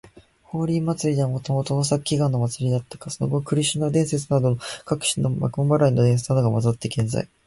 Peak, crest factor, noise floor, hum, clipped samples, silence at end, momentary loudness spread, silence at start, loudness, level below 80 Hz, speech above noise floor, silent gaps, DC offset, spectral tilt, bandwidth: -8 dBFS; 14 dB; -50 dBFS; none; under 0.1%; 0.2 s; 7 LU; 0.05 s; -22 LUFS; -52 dBFS; 28 dB; none; under 0.1%; -6 dB/octave; 11.5 kHz